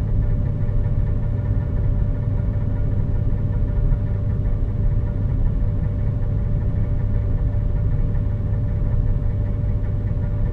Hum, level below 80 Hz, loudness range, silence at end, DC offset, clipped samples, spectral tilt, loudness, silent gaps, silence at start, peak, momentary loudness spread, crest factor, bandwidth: none; -22 dBFS; 0 LU; 0 s; under 0.1%; under 0.1%; -11.5 dB/octave; -23 LUFS; none; 0 s; -6 dBFS; 1 LU; 14 dB; 3.1 kHz